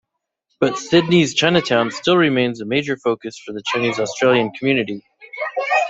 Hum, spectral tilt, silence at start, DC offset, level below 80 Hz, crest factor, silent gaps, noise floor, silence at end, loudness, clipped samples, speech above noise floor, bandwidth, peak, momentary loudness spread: none; -5 dB/octave; 0.6 s; under 0.1%; -58 dBFS; 18 dB; none; -73 dBFS; 0 s; -18 LUFS; under 0.1%; 55 dB; 8 kHz; -2 dBFS; 12 LU